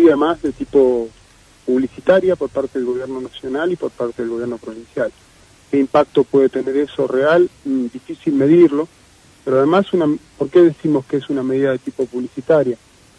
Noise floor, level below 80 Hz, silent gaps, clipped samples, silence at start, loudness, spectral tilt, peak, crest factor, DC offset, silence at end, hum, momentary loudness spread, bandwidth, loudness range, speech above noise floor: -47 dBFS; -54 dBFS; none; under 0.1%; 0 s; -17 LUFS; -7.5 dB/octave; -2 dBFS; 14 dB; under 0.1%; 0.45 s; none; 12 LU; 10.5 kHz; 5 LU; 31 dB